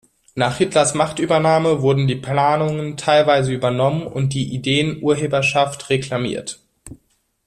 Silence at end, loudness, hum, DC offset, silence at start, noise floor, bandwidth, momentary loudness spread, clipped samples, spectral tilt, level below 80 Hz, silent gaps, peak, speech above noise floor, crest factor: 0.5 s; -18 LUFS; none; under 0.1%; 0.35 s; -63 dBFS; 12.5 kHz; 7 LU; under 0.1%; -5 dB/octave; -52 dBFS; none; -2 dBFS; 46 dB; 16 dB